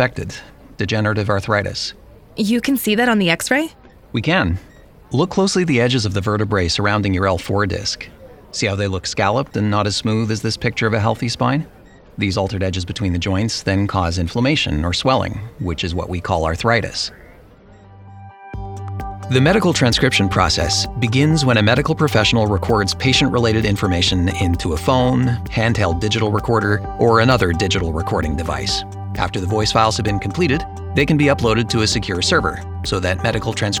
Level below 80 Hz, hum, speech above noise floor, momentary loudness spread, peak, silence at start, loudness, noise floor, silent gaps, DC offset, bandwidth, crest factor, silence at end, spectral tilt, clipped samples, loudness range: -34 dBFS; none; 27 dB; 9 LU; 0 dBFS; 0 s; -18 LUFS; -44 dBFS; none; under 0.1%; 18 kHz; 18 dB; 0 s; -5 dB/octave; under 0.1%; 5 LU